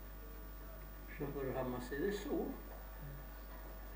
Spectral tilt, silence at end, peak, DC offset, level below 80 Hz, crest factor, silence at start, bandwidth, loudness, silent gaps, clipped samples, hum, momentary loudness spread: -6.5 dB/octave; 0 s; -26 dBFS; under 0.1%; -52 dBFS; 18 dB; 0 s; 16 kHz; -45 LUFS; none; under 0.1%; 50 Hz at -50 dBFS; 12 LU